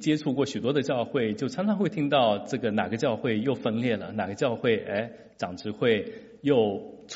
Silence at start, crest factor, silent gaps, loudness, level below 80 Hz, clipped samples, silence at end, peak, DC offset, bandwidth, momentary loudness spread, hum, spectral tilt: 0 s; 18 dB; none; -27 LUFS; -66 dBFS; under 0.1%; 0 s; -10 dBFS; under 0.1%; 8 kHz; 9 LU; none; -5 dB/octave